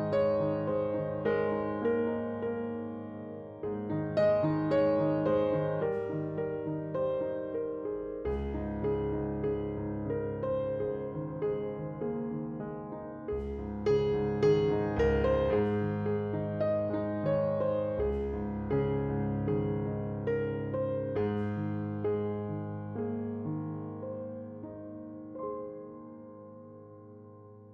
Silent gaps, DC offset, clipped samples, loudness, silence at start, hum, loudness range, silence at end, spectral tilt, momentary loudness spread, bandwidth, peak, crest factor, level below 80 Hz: none; under 0.1%; under 0.1%; -32 LUFS; 0 s; none; 9 LU; 0 s; -9.5 dB/octave; 14 LU; 7 kHz; -16 dBFS; 16 dB; -48 dBFS